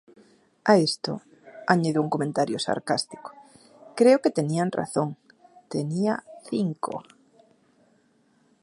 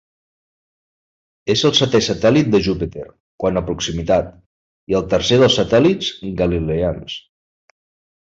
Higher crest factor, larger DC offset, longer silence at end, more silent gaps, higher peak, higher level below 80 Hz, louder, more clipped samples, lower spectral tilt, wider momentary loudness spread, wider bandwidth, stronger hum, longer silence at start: first, 24 dB vs 16 dB; neither; first, 1.6 s vs 1.1 s; second, none vs 3.20-3.38 s, 4.46-4.87 s; about the same, -2 dBFS vs -2 dBFS; second, -72 dBFS vs -38 dBFS; second, -25 LUFS vs -17 LUFS; neither; about the same, -5.5 dB/octave vs -5 dB/octave; about the same, 17 LU vs 16 LU; first, 11.5 kHz vs 7.8 kHz; neither; second, 0.65 s vs 1.45 s